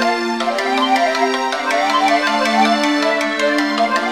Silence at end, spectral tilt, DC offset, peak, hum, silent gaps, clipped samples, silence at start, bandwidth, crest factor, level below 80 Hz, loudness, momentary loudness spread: 0 s; -2.5 dB/octave; 0.2%; -2 dBFS; none; none; under 0.1%; 0 s; 16 kHz; 14 dB; -68 dBFS; -16 LUFS; 4 LU